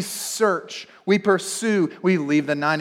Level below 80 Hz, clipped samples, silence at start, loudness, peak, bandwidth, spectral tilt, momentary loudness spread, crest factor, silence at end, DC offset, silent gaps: -76 dBFS; under 0.1%; 0 s; -22 LUFS; -6 dBFS; 17 kHz; -4.5 dB/octave; 8 LU; 16 dB; 0 s; under 0.1%; none